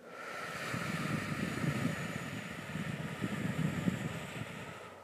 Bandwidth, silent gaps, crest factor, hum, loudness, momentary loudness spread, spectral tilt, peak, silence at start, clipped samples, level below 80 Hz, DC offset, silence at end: 15.5 kHz; none; 20 dB; none; -38 LUFS; 8 LU; -5.5 dB/octave; -18 dBFS; 0 s; under 0.1%; -62 dBFS; under 0.1%; 0 s